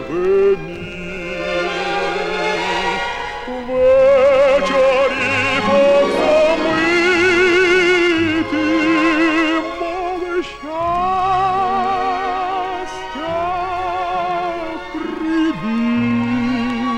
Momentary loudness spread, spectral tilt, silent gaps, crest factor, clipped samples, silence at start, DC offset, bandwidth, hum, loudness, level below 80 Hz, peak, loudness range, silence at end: 11 LU; -5 dB/octave; none; 12 dB; under 0.1%; 0 s; under 0.1%; 11 kHz; none; -16 LUFS; -42 dBFS; -4 dBFS; 7 LU; 0 s